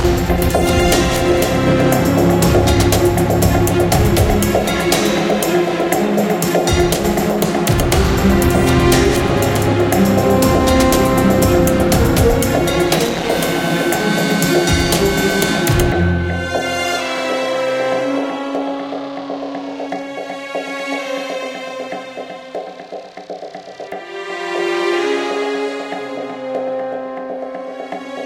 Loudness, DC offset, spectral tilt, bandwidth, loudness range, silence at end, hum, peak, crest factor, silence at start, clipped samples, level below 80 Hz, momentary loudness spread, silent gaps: -15 LUFS; under 0.1%; -5 dB/octave; 17 kHz; 11 LU; 0 s; none; 0 dBFS; 16 dB; 0 s; under 0.1%; -26 dBFS; 13 LU; none